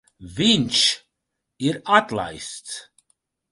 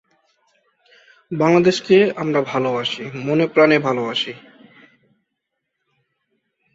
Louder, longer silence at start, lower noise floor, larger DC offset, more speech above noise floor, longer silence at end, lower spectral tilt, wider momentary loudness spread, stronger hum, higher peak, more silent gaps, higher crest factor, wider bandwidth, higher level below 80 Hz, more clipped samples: about the same, -20 LUFS vs -18 LUFS; second, 0.2 s vs 1.3 s; about the same, -80 dBFS vs -77 dBFS; neither; about the same, 59 dB vs 60 dB; second, 0.7 s vs 2.35 s; second, -3 dB/octave vs -6 dB/octave; first, 17 LU vs 11 LU; neither; about the same, -2 dBFS vs -2 dBFS; neither; about the same, 22 dB vs 18 dB; first, 11.5 kHz vs 7.8 kHz; first, -56 dBFS vs -64 dBFS; neither